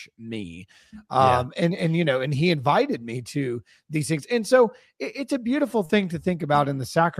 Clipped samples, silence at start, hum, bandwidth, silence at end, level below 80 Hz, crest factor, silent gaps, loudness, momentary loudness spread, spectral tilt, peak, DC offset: under 0.1%; 0 s; none; 15 kHz; 0 s; -60 dBFS; 18 dB; none; -23 LUFS; 15 LU; -6 dB/octave; -6 dBFS; under 0.1%